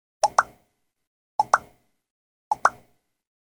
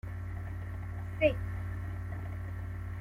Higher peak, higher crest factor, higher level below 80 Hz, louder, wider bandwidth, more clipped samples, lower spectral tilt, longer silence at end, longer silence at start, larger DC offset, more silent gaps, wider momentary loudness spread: first, -2 dBFS vs -14 dBFS; about the same, 26 dB vs 22 dB; second, -64 dBFS vs -46 dBFS; first, -24 LUFS vs -37 LUFS; first, 19.5 kHz vs 4.9 kHz; neither; second, -1 dB/octave vs -8 dB/octave; first, 0.8 s vs 0 s; first, 0.25 s vs 0.05 s; neither; first, 1.07-1.39 s, 2.11-2.51 s vs none; about the same, 9 LU vs 10 LU